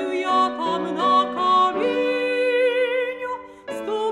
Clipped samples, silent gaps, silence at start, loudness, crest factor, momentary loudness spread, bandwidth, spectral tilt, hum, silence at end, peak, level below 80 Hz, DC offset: under 0.1%; none; 0 s; -21 LUFS; 14 dB; 12 LU; 11.5 kHz; -4 dB/octave; none; 0 s; -8 dBFS; -66 dBFS; under 0.1%